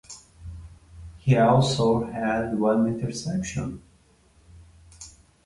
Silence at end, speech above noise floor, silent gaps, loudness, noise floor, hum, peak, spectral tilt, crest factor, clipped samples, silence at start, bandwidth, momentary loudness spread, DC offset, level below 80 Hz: 0.35 s; 36 dB; none; -24 LUFS; -59 dBFS; none; -6 dBFS; -6.5 dB/octave; 20 dB; under 0.1%; 0.1 s; 11.5 kHz; 25 LU; under 0.1%; -48 dBFS